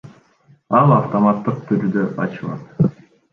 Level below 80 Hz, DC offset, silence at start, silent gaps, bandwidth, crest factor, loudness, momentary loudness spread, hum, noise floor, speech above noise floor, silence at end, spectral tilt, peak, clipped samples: -52 dBFS; under 0.1%; 0.05 s; none; 6 kHz; 18 dB; -18 LUFS; 11 LU; none; -54 dBFS; 37 dB; 0.4 s; -10.5 dB/octave; -2 dBFS; under 0.1%